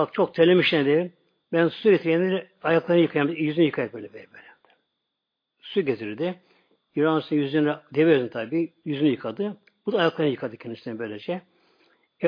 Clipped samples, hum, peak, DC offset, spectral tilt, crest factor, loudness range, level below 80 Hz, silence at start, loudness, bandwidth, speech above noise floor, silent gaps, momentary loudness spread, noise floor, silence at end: under 0.1%; none; -6 dBFS; under 0.1%; -8.5 dB/octave; 18 dB; 7 LU; -74 dBFS; 0 s; -24 LUFS; 5.2 kHz; 59 dB; none; 13 LU; -82 dBFS; 0 s